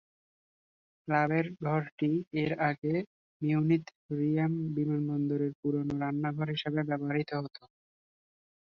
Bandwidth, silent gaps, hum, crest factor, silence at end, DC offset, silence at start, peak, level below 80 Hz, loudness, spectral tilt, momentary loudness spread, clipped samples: 6.2 kHz; 1.92-1.98 s, 2.27-2.31 s, 2.78-2.82 s, 3.06-3.40 s, 3.95-4.09 s, 5.55-5.63 s; none; 18 dB; 1.05 s; under 0.1%; 1.05 s; -14 dBFS; -70 dBFS; -32 LUFS; -9 dB/octave; 7 LU; under 0.1%